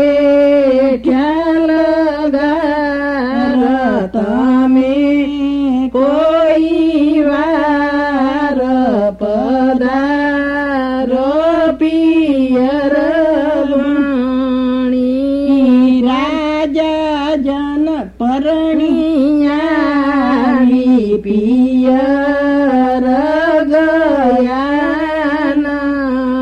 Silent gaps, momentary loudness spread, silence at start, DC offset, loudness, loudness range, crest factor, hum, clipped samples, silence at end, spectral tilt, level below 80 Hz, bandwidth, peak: none; 5 LU; 0 s; under 0.1%; -13 LUFS; 2 LU; 10 dB; none; under 0.1%; 0 s; -6.5 dB/octave; -40 dBFS; 6.8 kHz; -2 dBFS